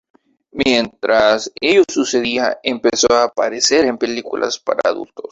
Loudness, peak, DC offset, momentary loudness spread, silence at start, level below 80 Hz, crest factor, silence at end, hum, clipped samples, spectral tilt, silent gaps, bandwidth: -16 LUFS; 0 dBFS; under 0.1%; 8 LU; 0.55 s; -52 dBFS; 16 dB; 0.1 s; none; under 0.1%; -2 dB/octave; none; 8 kHz